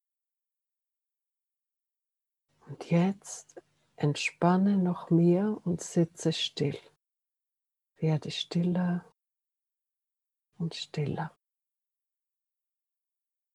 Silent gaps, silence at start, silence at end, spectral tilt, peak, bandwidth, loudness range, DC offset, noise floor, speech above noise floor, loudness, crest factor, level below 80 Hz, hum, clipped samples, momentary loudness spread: none; 2.7 s; 2.25 s; -6 dB/octave; -10 dBFS; 11.5 kHz; 12 LU; under 0.1%; -89 dBFS; 61 dB; -29 LUFS; 22 dB; -74 dBFS; none; under 0.1%; 14 LU